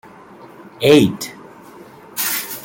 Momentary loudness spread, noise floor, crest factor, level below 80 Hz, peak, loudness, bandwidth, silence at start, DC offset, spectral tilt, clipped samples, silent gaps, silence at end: 17 LU; -41 dBFS; 18 dB; -54 dBFS; -2 dBFS; -15 LUFS; 17 kHz; 0.6 s; under 0.1%; -4.5 dB/octave; under 0.1%; none; 0 s